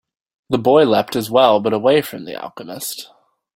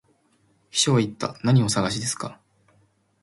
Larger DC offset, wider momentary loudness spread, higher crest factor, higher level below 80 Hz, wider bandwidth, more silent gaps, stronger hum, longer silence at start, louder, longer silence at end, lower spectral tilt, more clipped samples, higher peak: neither; first, 17 LU vs 9 LU; about the same, 16 dB vs 18 dB; about the same, -58 dBFS vs -58 dBFS; first, 16.5 kHz vs 11.5 kHz; neither; neither; second, 0.5 s vs 0.75 s; first, -16 LUFS vs -23 LUFS; second, 0.5 s vs 0.9 s; about the same, -5 dB/octave vs -4.5 dB/octave; neither; first, 0 dBFS vs -6 dBFS